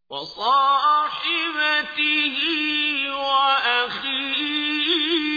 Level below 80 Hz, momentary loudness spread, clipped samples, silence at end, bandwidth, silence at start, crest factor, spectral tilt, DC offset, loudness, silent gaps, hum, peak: -64 dBFS; 5 LU; under 0.1%; 0 s; 5 kHz; 0.1 s; 14 dB; -2.5 dB/octave; under 0.1%; -20 LUFS; none; none; -8 dBFS